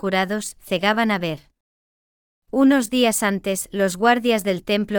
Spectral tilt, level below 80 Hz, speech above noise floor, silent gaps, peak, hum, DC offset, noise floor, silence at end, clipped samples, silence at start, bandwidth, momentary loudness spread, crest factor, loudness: -4 dB/octave; -56 dBFS; over 70 dB; 1.60-2.42 s; -4 dBFS; none; under 0.1%; under -90 dBFS; 0 s; under 0.1%; 0.05 s; 19.5 kHz; 9 LU; 16 dB; -20 LUFS